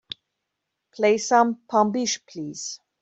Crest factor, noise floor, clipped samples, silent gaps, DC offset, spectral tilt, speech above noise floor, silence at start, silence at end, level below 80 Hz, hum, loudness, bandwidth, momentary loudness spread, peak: 20 dB; -81 dBFS; under 0.1%; none; under 0.1%; -3.5 dB/octave; 59 dB; 0.95 s; 0.25 s; -72 dBFS; none; -23 LUFS; 8.2 kHz; 16 LU; -4 dBFS